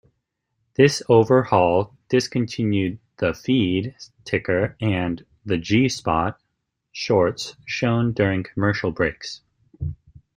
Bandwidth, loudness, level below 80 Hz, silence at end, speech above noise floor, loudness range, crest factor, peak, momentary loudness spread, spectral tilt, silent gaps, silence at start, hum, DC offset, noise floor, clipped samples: 15.5 kHz; -21 LUFS; -50 dBFS; 0.4 s; 56 dB; 4 LU; 20 dB; -2 dBFS; 15 LU; -6 dB/octave; none; 0.8 s; none; under 0.1%; -76 dBFS; under 0.1%